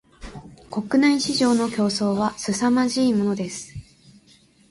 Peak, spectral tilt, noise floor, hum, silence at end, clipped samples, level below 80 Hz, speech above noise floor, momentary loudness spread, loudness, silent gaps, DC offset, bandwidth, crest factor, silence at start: -8 dBFS; -4.5 dB/octave; -55 dBFS; none; 0.9 s; under 0.1%; -52 dBFS; 35 dB; 22 LU; -21 LUFS; none; under 0.1%; 11.5 kHz; 14 dB; 0.2 s